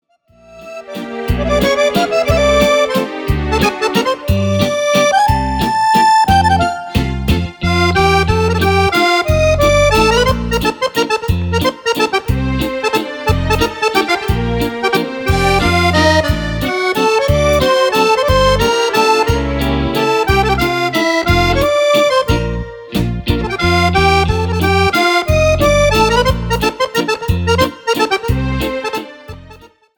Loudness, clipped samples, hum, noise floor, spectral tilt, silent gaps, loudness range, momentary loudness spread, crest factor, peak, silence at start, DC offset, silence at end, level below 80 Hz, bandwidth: -13 LUFS; under 0.1%; none; -46 dBFS; -5 dB/octave; none; 3 LU; 7 LU; 14 dB; 0 dBFS; 0.5 s; under 0.1%; 0.3 s; -24 dBFS; over 20 kHz